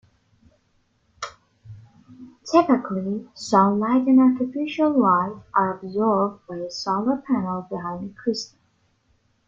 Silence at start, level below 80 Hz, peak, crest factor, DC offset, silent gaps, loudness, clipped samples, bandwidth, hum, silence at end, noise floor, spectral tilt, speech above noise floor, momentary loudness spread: 1.2 s; -64 dBFS; -2 dBFS; 20 dB; under 0.1%; none; -22 LUFS; under 0.1%; 7.6 kHz; none; 1 s; -66 dBFS; -6.5 dB/octave; 45 dB; 15 LU